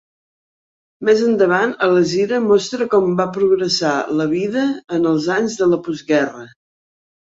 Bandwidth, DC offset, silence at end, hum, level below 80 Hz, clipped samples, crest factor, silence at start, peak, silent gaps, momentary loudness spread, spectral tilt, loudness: 8 kHz; under 0.1%; 0.9 s; none; -60 dBFS; under 0.1%; 14 dB; 1 s; -2 dBFS; none; 5 LU; -5 dB/octave; -17 LUFS